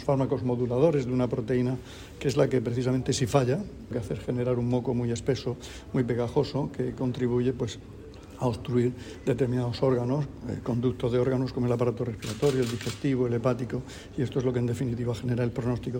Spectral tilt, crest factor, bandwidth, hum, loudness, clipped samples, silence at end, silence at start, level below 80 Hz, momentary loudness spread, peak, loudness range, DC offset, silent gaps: -7 dB/octave; 20 dB; 16 kHz; none; -28 LUFS; under 0.1%; 0 s; 0 s; -50 dBFS; 9 LU; -8 dBFS; 3 LU; under 0.1%; none